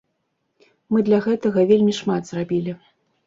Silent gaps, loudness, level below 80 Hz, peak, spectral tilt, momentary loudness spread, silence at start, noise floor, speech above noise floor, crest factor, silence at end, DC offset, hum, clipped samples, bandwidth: none; -20 LUFS; -62 dBFS; -4 dBFS; -7 dB/octave; 9 LU; 0.9 s; -73 dBFS; 54 dB; 16 dB; 0.5 s; under 0.1%; none; under 0.1%; 7.8 kHz